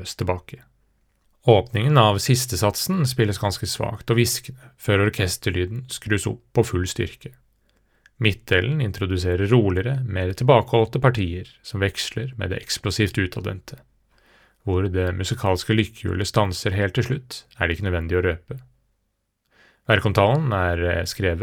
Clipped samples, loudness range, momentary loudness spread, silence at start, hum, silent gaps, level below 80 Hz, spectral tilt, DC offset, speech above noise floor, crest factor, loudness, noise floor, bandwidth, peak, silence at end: under 0.1%; 5 LU; 11 LU; 0 s; none; none; -48 dBFS; -5.5 dB/octave; under 0.1%; 51 dB; 22 dB; -22 LUFS; -73 dBFS; 19 kHz; -2 dBFS; 0 s